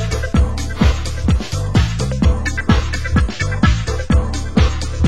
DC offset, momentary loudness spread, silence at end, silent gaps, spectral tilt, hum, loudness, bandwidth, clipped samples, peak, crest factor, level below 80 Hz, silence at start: 3%; 3 LU; 0 s; none; -6 dB/octave; none; -17 LUFS; 12 kHz; under 0.1%; 0 dBFS; 16 dB; -18 dBFS; 0 s